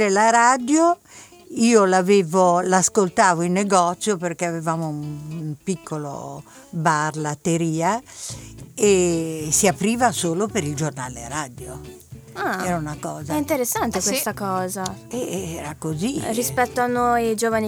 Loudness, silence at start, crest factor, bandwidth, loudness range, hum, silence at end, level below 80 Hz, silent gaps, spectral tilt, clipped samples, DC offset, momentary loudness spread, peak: -21 LUFS; 0 s; 20 dB; over 20 kHz; 8 LU; none; 0 s; -52 dBFS; none; -4.5 dB/octave; under 0.1%; under 0.1%; 15 LU; -2 dBFS